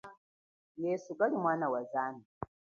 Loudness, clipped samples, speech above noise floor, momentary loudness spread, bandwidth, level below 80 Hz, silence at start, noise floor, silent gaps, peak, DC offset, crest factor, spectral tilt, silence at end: -34 LUFS; under 0.1%; over 57 dB; 17 LU; 7.2 kHz; -70 dBFS; 0.05 s; under -90 dBFS; 0.18-0.75 s, 2.25-2.41 s; -16 dBFS; under 0.1%; 20 dB; -7 dB/octave; 0.35 s